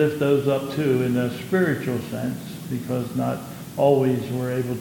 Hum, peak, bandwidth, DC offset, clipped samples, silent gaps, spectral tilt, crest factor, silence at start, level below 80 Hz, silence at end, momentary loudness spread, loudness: none; -6 dBFS; 17.5 kHz; under 0.1%; under 0.1%; none; -7 dB/octave; 16 dB; 0 s; -60 dBFS; 0 s; 10 LU; -23 LUFS